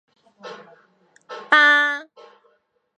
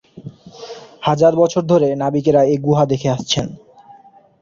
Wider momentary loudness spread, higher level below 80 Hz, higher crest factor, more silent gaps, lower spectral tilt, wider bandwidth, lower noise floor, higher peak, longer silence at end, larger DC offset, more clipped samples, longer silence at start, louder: first, 26 LU vs 22 LU; second, -80 dBFS vs -50 dBFS; first, 22 dB vs 16 dB; neither; second, -1 dB/octave vs -6 dB/octave; first, 9.8 kHz vs 7.6 kHz; first, -66 dBFS vs -46 dBFS; about the same, 0 dBFS vs 0 dBFS; about the same, 0.95 s vs 0.85 s; neither; neither; first, 0.45 s vs 0.15 s; about the same, -16 LUFS vs -16 LUFS